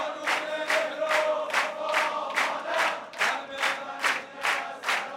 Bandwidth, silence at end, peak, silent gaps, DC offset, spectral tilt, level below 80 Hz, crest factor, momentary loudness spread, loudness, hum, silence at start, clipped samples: 16.5 kHz; 0 s; -8 dBFS; none; under 0.1%; -0.5 dB/octave; -82 dBFS; 20 dB; 3 LU; -27 LUFS; none; 0 s; under 0.1%